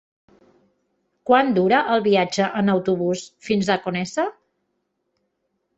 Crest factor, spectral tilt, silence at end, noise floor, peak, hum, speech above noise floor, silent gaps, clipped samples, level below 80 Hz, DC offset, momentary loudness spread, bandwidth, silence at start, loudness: 20 dB; -5.5 dB/octave; 1.45 s; -74 dBFS; -4 dBFS; none; 54 dB; none; under 0.1%; -64 dBFS; under 0.1%; 8 LU; 8.2 kHz; 1.25 s; -20 LUFS